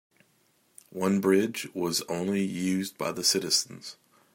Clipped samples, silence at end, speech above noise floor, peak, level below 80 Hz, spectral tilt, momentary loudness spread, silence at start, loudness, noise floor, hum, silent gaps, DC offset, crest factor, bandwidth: under 0.1%; 0.4 s; 40 dB; -10 dBFS; -74 dBFS; -3.5 dB/octave; 14 LU; 0.95 s; -27 LUFS; -68 dBFS; none; none; under 0.1%; 20 dB; 16.5 kHz